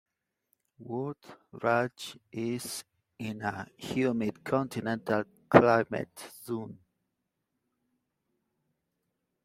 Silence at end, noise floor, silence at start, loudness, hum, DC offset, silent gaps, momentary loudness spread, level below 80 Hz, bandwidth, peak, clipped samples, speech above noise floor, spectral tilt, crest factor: 2.7 s; -83 dBFS; 0.8 s; -30 LUFS; none; under 0.1%; none; 18 LU; -68 dBFS; 16 kHz; -2 dBFS; under 0.1%; 53 dB; -6 dB/octave; 30 dB